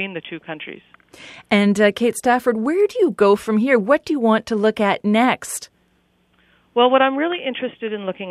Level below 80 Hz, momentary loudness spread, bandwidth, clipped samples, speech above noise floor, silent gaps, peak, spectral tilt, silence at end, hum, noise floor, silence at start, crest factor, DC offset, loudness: -62 dBFS; 14 LU; 14.5 kHz; under 0.1%; 43 dB; none; -2 dBFS; -5 dB/octave; 0 s; none; -62 dBFS; 0 s; 18 dB; under 0.1%; -18 LUFS